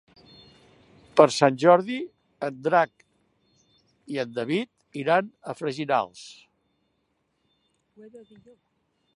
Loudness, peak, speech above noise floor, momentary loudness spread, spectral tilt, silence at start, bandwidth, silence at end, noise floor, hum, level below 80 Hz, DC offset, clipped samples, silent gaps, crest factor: -24 LUFS; -2 dBFS; 50 dB; 17 LU; -5 dB/octave; 1.15 s; 11.5 kHz; 1 s; -74 dBFS; none; -74 dBFS; under 0.1%; under 0.1%; none; 26 dB